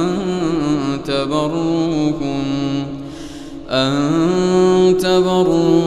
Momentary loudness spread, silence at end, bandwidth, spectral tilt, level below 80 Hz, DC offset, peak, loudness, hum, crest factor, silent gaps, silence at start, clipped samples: 12 LU; 0 s; 13 kHz; -6 dB/octave; -44 dBFS; under 0.1%; -2 dBFS; -16 LUFS; none; 14 dB; none; 0 s; under 0.1%